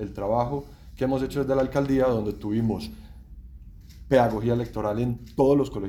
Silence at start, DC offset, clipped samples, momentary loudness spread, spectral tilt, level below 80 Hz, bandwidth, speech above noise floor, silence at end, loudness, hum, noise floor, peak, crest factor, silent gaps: 0 s; under 0.1%; under 0.1%; 10 LU; -8 dB/octave; -44 dBFS; 17.5 kHz; 20 dB; 0 s; -25 LUFS; none; -44 dBFS; -6 dBFS; 20 dB; none